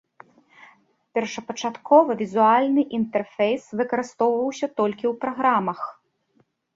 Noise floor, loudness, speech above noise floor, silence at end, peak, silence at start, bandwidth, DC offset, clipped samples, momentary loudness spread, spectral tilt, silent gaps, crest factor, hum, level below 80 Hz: -66 dBFS; -22 LUFS; 44 dB; 0.85 s; -2 dBFS; 1.15 s; 7.8 kHz; under 0.1%; under 0.1%; 12 LU; -5.5 dB/octave; none; 20 dB; none; -70 dBFS